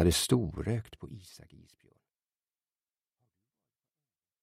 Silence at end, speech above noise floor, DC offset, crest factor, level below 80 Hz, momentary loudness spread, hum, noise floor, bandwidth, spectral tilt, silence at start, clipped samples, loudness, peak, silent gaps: 3.2 s; over 58 dB; under 0.1%; 22 dB; -50 dBFS; 22 LU; none; under -90 dBFS; 15.5 kHz; -5 dB/octave; 0 s; under 0.1%; -30 LUFS; -12 dBFS; none